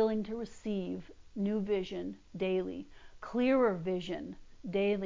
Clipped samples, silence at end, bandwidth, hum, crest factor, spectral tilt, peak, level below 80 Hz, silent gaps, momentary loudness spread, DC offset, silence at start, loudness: under 0.1%; 0 s; 7.6 kHz; none; 16 dB; -7.5 dB/octave; -18 dBFS; -60 dBFS; none; 17 LU; under 0.1%; 0 s; -34 LUFS